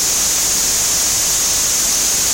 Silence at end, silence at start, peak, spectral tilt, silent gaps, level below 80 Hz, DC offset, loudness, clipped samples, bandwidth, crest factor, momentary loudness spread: 0 s; 0 s; -4 dBFS; 0.5 dB/octave; none; -38 dBFS; under 0.1%; -12 LUFS; under 0.1%; 17 kHz; 10 dB; 0 LU